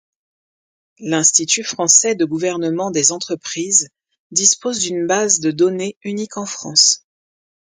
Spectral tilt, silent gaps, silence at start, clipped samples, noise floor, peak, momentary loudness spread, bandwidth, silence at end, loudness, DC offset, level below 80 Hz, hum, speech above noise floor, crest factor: -2 dB/octave; 4.19-4.30 s, 5.97-6.01 s; 1 s; under 0.1%; under -90 dBFS; 0 dBFS; 13 LU; 10.5 kHz; 0.75 s; -15 LUFS; under 0.1%; -66 dBFS; none; over 73 dB; 18 dB